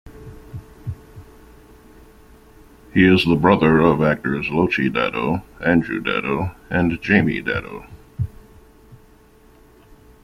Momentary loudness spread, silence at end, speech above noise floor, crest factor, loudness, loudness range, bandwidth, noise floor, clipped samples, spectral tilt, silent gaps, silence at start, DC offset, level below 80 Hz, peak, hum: 22 LU; 1.3 s; 32 dB; 20 dB; -19 LUFS; 6 LU; 14.5 kHz; -50 dBFS; under 0.1%; -7.5 dB/octave; none; 0.05 s; under 0.1%; -44 dBFS; -2 dBFS; none